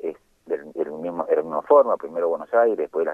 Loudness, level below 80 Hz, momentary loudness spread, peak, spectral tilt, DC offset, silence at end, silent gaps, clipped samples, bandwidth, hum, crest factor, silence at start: -22 LUFS; -70 dBFS; 13 LU; -4 dBFS; -7.5 dB/octave; under 0.1%; 0 s; none; under 0.1%; 3.6 kHz; none; 18 dB; 0.05 s